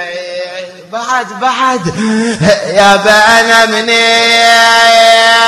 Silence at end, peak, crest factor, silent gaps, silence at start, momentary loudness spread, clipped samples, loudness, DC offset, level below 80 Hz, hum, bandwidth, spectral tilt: 0 s; 0 dBFS; 8 dB; none; 0 s; 16 LU; 2%; -7 LUFS; under 0.1%; -44 dBFS; none; 17.5 kHz; -2.5 dB/octave